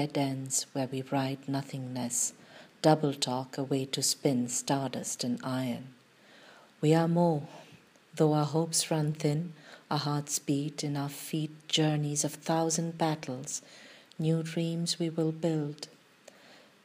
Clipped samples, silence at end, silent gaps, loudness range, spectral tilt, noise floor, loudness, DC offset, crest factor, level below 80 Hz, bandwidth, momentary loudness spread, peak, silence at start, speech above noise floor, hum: under 0.1%; 0.3 s; none; 2 LU; -4.5 dB/octave; -58 dBFS; -31 LUFS; under 0.1%; 22 dB; -80 dBFS; 15.5 kHz; 10 LU; -10 dBFS; 0 s; 27 dB; none